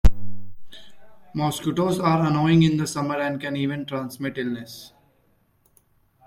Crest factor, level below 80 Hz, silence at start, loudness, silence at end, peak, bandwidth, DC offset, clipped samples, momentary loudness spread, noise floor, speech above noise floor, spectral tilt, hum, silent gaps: 20 dB; -34 dBFS; 0.05 s; -23 LUFS; 1.4 s; -4 dBFS; 15.5 kHz; under 0.1%; under 0.1%; 16 LU; -63 dBFS; 40 dB; -6.5 dB/octave; none; none